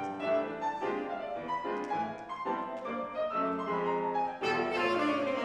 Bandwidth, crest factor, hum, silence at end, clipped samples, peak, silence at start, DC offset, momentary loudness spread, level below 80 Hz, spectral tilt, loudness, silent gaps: 11.5 kHz; 16 dB; none; 0 s; under 0.1%; -16 dBFS; 0 s; under 0.1%; 7 LU; -70 dBFS; -5.5 dB/octave; -33 LUFS; none